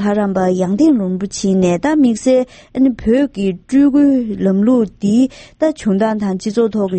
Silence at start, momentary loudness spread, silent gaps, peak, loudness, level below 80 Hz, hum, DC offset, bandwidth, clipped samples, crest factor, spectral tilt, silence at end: 0 s; 6 LU; none; -2 dBFS; -15 LUFS; -44 dBFS; none; under 0.1%; 8.8 kHz; under 0.1%; 12 dB; -7 dB/octave; 0 s